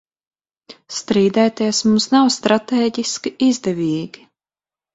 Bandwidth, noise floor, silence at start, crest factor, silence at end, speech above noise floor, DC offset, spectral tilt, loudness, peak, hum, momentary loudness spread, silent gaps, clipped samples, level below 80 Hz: 8.2 kHz; under -90 dBFS; 0.7 s; 18 dB; 0.9 s; over 73 dB; under 0.1%; -4.5 dB/octave; -17 LUFS; 0 dBFS; none; 10 LU; none; under 0.1%; -60 dBFS